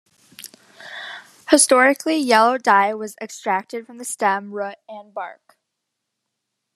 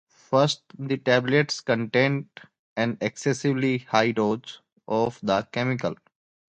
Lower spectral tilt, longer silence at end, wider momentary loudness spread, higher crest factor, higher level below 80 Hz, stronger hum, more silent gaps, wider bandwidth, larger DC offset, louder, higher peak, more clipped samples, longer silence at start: second, -2 dB/octave vs -5.5 dB/octave; first, 1.4 s vs 0.55 s; first, 22 LU vs 10 LU; about the same, 20 dB vs 20 dB; about the same, -68 dBFS vs -64 dBFS; neither; second, none vs 2.59-2.76 s; first, 14 kHz vs 9.2 kHz; neither; first, -18 LUFS vs -25 LUFS; first, 0 dBFS vs -4 dBFS; neither; about the same, 0.4 s vs 0.3 s